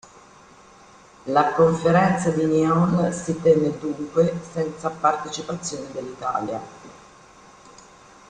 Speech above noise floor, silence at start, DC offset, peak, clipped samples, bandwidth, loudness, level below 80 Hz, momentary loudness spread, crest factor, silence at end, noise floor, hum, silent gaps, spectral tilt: 28 dB; 1.25 s; under 0.1%; -4 dBFS; under 0.1%; 9.6 kHz; -22 LUFS; -56 dBFS; 12 LU; 18 dB; 1.35 s; -49 dBFS; none; none; -6.5 dB/octave